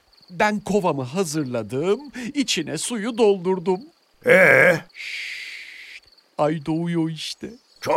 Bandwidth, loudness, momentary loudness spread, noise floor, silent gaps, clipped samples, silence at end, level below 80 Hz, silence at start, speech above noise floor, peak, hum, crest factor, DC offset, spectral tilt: 16 kHz; -21 LUFS; 19 LU; -46 dBFS; none; under 0.1%; 0 s; -60 dBFS; 0.3 s; 25 dB; 0 dBFS; none; 22 dB; under 0.1%; -4.5 dB/octave